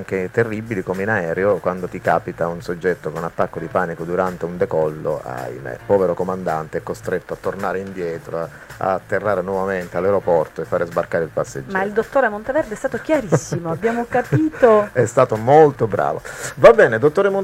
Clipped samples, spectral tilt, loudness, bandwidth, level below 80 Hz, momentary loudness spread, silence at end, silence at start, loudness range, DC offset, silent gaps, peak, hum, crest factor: under 0.1%; -6.5 dB/octave; -19 LUFS; 15.5 kHz; -48 dBFS; 12 LU; 0 s; 0 s; 8 LU; under 0.1%; none; 0 dBFS; none; 18 dB